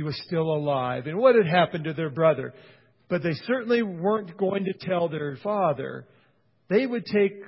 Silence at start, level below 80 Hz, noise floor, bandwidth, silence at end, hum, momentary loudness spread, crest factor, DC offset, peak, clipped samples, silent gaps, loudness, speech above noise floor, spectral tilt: 0 s; -66 dBFS; -65 dBFS; 5.8 kHz; 0 s; none; 10 LU; 20 dB; under 0.1%; -6 dBFS; under 0.1%; none; -25 LUFS; 40 dB; -11 dB/octave